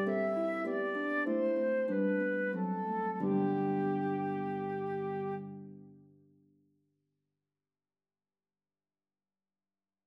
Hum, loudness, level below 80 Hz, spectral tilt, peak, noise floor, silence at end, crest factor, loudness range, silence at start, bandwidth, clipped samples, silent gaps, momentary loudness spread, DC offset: none; -34 LUFS; -90 dBFS; -9.5 dB/octave; -22 dBFS; under -90 dBFS; 4.1 s; 14 dB; 11 LU; 0 s; 5.6 kHz; under 0.1%; none; 6 LU; under 0.1%